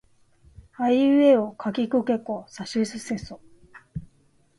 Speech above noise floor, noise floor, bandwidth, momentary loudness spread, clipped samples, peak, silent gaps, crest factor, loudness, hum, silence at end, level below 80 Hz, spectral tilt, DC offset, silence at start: 39 dB; -62 dBFS; 11.5 kHz; 22 LU; under 0.1%; -6 dBFS; none; 18 dB; -23 LUFS; none; 0.55 s; -56 dBFS; -6 dB/octave; under 0.1%; 0.8 s